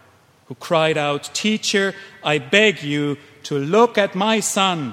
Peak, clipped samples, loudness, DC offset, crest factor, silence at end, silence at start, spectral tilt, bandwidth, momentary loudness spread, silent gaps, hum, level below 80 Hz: 0 dBFS; under 0.1%; -19 LUFS; under 0.1%; 20 dB; 0 s; 0.5 s; -3.5 dB/octave; 16 kHz; 11 LU; none; none; -66 dBFS